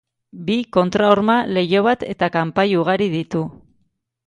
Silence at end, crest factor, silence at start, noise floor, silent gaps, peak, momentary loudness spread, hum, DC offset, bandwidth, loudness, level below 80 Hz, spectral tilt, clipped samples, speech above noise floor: 0.75 s; 18 dB; 0.35 s; -66 dBFS; none; 0 dBFS; 9 LU; none; under 0.1%; 10.5 kHz; -18 LUFS; -54 dBFS; -7 dB/octave; under 0.1%; 49 dB